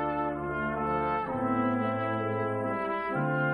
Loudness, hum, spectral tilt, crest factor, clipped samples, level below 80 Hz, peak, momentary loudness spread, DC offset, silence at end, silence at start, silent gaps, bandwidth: -30 LUFS; none; -9 dB/octave; 12 dB; under 0.1%; -54 dBFS; -16 dBFS; 3 LU; under 0.1%; 0 s; 0 s; none; 9.4 kHz